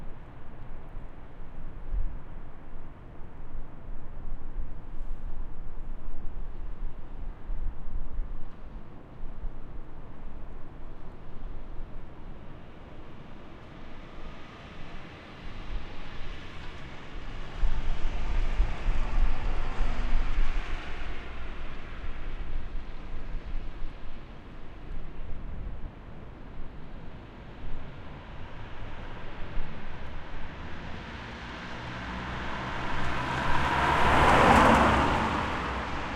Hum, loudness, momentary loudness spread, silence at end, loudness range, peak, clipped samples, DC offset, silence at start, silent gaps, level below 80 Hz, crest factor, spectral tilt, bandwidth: none; -31 LUFS; 19 LU; 0 s; 19 LU; -8 dBFS; under 0.1%; under 0.1%; 0 s; none; -34 dBFS; 20 dB; -5.5 dB/octave; 9 kHz